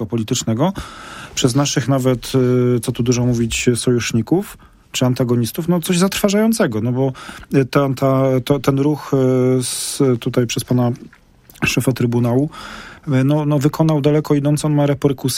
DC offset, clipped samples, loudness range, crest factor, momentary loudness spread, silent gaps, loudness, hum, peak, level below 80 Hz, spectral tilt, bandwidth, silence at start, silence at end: under 0.1%; under 0.1%; 2 LU; 16 dB; 6 LU; none; -17 LUFS; none; 0 dBFS; -44 dBFS; -5.5 dB/octave; 16.5 kHz; 0 s; 0 s